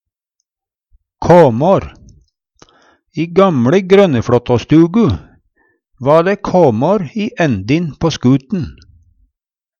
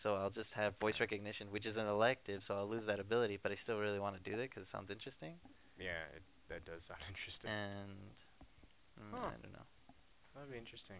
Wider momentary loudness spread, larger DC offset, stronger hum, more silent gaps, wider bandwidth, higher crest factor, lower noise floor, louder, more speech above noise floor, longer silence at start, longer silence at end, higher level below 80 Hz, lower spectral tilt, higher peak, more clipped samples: second, 13 LU vs 17 LU; neither; neither; neither; first, 8 kHz vs 4 kHz; second, 14 dB vs 24 dB; first, -86 dBFS vs -68 dBFS; first, -12 LUFS vs -43 LUFS; first, 74 dB vs 25 dB; first, 1.2 s vs 0 s; first, 1.1 s vs 0 s; first, -42 dBFS vs -68 dBFS; first, -7.5 dB/octave vs -3.5 dB/octave; first, 0 dBFS vs -20 dBFS; neither